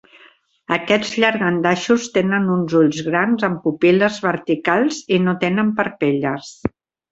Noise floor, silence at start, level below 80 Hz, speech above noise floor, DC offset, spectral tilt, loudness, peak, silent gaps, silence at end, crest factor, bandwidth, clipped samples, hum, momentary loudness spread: -51 dBFS; 0.7 s; -54 dBFS; 34 dB; under 0.1%; -5.5 dB/octave; -18 LUFS; -2 dBFS; none; 0.45 s; 16 dB; 8 kHz; under 0.1%; none; 7 LU